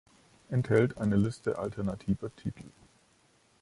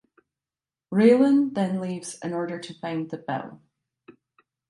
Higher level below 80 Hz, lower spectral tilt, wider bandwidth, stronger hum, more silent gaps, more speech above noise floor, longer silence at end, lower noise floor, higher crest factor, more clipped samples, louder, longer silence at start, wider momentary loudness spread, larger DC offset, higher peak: first, -54 dBFS vs -74 dBFS; first, -8 dB/octave vs -6.5 dB/octave; about the same, 11.5 kHz vs 11.5 kHz; neither; neither; second, 36 dB vs over 67 dB; first, 0.9 s vs 0.6 s; second, -66 dBFS vs under -90 dBFS; about the same, 20 dB vs 20 dB; neither; second, -31 LUFS vs -24 LUFS; second, 0.5 s vs 0.9 s; about the same, 14 LU vs 15 LU; neither; second, -12 dBFS vs -6 dBFS